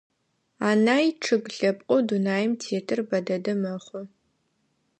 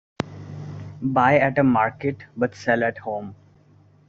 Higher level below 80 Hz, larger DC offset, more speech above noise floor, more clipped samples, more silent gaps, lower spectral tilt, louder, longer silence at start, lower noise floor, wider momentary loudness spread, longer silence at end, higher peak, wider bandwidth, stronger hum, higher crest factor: second, -76 dBFS vs -58 dBFS; neither; first, 48 dB vs 33 dB; neither; neither; about the same, -5.5 dB/octave vs -6 dB/octave; second, -25 LUFS vs -22 LUFS; first, 0.6 s vs 0.2 s; first, -72 dBFS vs -54 dBFS; second, 9 LU vs 18 LU; first, 0.9 s vs 0.75 s; second, -8 dBFS vs -4 dBFS; first, 9 kHz vs 7.4 kHz; neither; about the same, 18 dB vs 20 dB